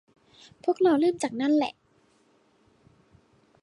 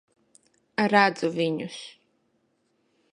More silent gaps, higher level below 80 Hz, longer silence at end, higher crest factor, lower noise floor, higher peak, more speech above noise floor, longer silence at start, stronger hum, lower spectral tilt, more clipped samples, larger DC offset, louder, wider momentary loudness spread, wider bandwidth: neither; about the same, -72 dBFS vs -76 dBFS; first, 1.9 s vs 1.25 s; second, 16 dB vs 24 dB; second, -64 dBFS vs -71 dBFS; second, -12 dBFS vs -4 dBFS; second, 40 dB vs 47 dB; second, 0.65 s vs 0.8 s; neither; about the same, -4.5 dB/octave vs -5.5 dB/octave; neither; neither; about the same, -25 LUFS vs -24 LUFS; second, 10 LU vs 19 LU; about the same, 11.5 kHz vs 10.5 kHz